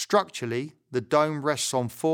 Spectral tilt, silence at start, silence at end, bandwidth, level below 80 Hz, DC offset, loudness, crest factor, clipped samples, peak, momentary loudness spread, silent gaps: -4 dB/octave; 0 s; 0 s; over 20 kHz; -70 dBFS; under 0.1%; -27 LUFS; 20 dB; under 0.1%; -6 dBFS; 9 LU; none